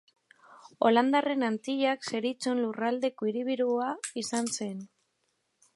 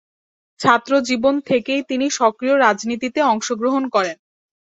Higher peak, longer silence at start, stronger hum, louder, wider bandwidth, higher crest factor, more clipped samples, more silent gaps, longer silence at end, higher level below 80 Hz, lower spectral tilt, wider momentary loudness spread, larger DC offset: second, -10 dBFS vs 0 dBFS; about the same, 0.5 s vs 0.6 s; neither; second, -29 LUFS vs -18 LUFS; first, 11.5 kHz vs 8 kHz; about the same, 20 dB vs 18 dB; neither; neither; first, 0.9 s vs 0.55 s; second, -84 dBFS vs -62 dBFS; about the same, -3.5 dB/octave vs -3.5 dB/octave; first, 9 LU vs 6 LU; neither